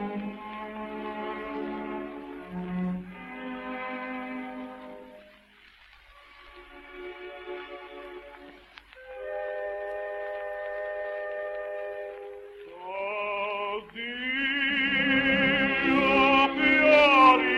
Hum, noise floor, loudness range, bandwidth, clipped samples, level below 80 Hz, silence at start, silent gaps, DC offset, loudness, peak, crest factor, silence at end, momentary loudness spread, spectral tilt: none; -56 dBFS; 21 LU; 12 kHz; under 0.1%; -58 dBFS; 0 s; none; under 0.1%; -26 LUFS; -6 dBFS; 22 dB; 0 s; 22 LU; -5.5 dB/octave